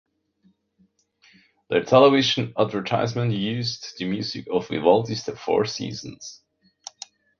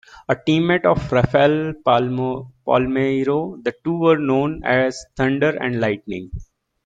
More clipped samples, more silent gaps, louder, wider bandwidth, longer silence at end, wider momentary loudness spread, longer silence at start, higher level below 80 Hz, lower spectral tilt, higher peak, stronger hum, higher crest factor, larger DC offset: neither; neither; second, -22 LUFS vs -19 LUFS; second, 7.2 kHz vs 9 kHz; first, 1.05 s vs 0.4 s; first, 23 LU vs 10 LU; first, 1.7 s vs 0.15 s; second, -62 dBFS vs -44 dBFS; second, -5.5 dB/octave vs -7 dB/octave; about the same, -2 dBFS vs -2 dBFS; neither; about the same, 22 dB vs 18 dB; neither